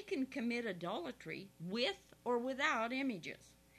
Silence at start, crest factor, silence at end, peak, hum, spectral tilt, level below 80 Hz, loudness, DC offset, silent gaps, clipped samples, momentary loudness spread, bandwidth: 0 s; 20 dB; 0.25 s; -20 dBFS; 60 Hz at -70 dBFS; -4.5 dB/octave; -76 dBFS; -40 LUFS; under 0.1%; none; under 0.1%; 12 LU; 13.5 kHz